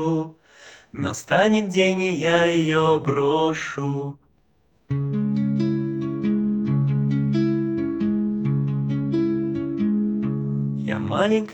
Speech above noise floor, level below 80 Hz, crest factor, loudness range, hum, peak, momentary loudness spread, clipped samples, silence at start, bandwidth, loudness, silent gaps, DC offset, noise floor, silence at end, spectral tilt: 43 dB; -58 dBFS; 18 dB; 4 LU; none; -4 dBFS; 8 LU; under 0.1%; 0 s; 17.5 kHz; -22 LUFS; none; under 0.1%; -64 dBFS; 0 s; -6.5 dB/octave